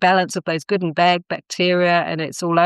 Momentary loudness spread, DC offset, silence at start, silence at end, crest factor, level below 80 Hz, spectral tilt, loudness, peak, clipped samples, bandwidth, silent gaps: 7 LU; under 0.1%; 0 s; 0 s; 16 dB; -72 dBFS; -4.5 dB/octave; -19 LUFS; -2 dBFS; under 0.1%; 12.5 kHz; none